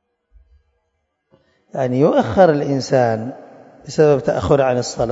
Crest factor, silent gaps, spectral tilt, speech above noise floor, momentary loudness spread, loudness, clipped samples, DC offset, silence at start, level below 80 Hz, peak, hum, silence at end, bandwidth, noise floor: 18 dB; none; -6.5 dB/octave; 55 dB; 11 LU; -16 LUFS; under 0.1%; under 0.1%; 1.75 s; -46 dBFS; 0 dBFS; none; 0 s; 8 kHz; -71 dBFS